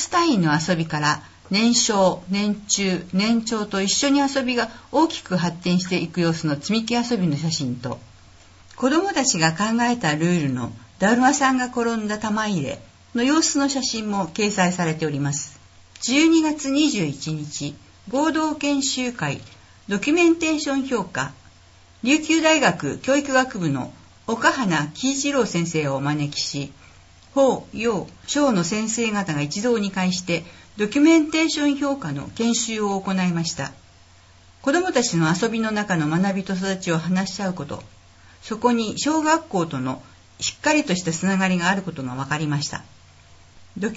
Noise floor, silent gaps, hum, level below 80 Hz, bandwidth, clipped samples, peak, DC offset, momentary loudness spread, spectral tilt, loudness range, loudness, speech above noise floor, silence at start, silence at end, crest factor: -50 dBFS; none; none; -56 dBFS; 8 kHz; under 0.1%; -4 dBFS; under 0.1%; 11 LU; -4 dB/octave; 3 LU; -21 LUFS; 29 dB; 0 s; 0 s; 18 dB